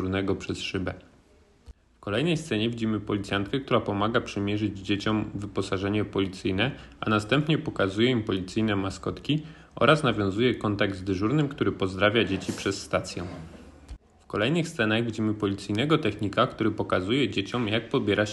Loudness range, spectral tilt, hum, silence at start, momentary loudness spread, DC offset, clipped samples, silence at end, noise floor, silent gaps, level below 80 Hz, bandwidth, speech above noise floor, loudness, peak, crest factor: 4 LU; -6 dB/octave; none; 0 s; 7 LU; under 0.1%; under 0.1%; 0 s; -59 dBFS; none; -52 dBFS; 12 kHz; 32 dB; -27 LUFS; -4 dBFS; 22 dB